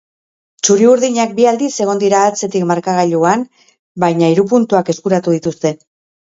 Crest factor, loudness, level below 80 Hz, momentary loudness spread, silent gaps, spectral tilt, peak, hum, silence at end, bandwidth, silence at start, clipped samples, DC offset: 14 dB; -13 LUFS; -60 dBFS; 8 LU; 3.79-3.95 s; -5 dB/octave; 0 dBFS; none; 0.45 s; 8 kHz; 0.65 s; under 0.1%; under 0.1%